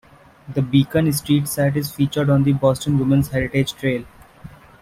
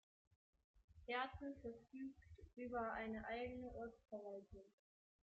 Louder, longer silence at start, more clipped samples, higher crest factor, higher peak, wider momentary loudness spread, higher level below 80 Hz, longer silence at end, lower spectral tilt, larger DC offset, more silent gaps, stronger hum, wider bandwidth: first, -19 LUFS vs -50 LUFS; second, 0.45 s vs 0.75 s; neither; about the same, 16 dB vs 20 dB; first, -2 dBFS vs -32 dBFS; second, 7 LU vs 16 LU; first, -46 dBFS vs -70 dBFS; second, 0.35 s vs 0.6 s; first, -6.5 dB/octave vs -3.5 dB/octave; neither; second, none vs 0.84-0.88 s; neither; first, 16 kHz vs 8 kHz